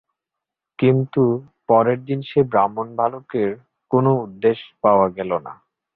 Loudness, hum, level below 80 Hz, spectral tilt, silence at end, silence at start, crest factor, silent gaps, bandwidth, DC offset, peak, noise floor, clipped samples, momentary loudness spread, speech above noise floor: -20 LUFS; none; -58 dBFS; -11.5 dB/octave; 0.4 s; 0.8 s; 18 dB; none; 4.5 kHz; under 0.1%; -2 dBFS; -84 dBFS; under 0.1%; 9 LU; 66 dB